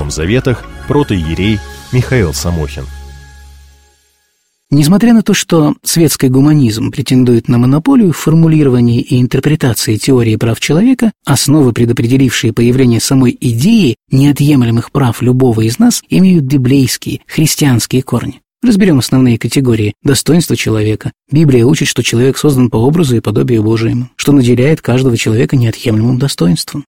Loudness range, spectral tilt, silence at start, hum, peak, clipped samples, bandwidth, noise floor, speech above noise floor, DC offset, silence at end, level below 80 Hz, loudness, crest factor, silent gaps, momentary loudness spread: 5 LU; -6 dB/octave; 0 s; none; 0 dBFS; under 0.1%; 16.5 kHz; -60 dBFS; 51 dB; 0.9%; 0.05 s; -32 dBFS; -10 LUFS; 10 dB; none; 6 LU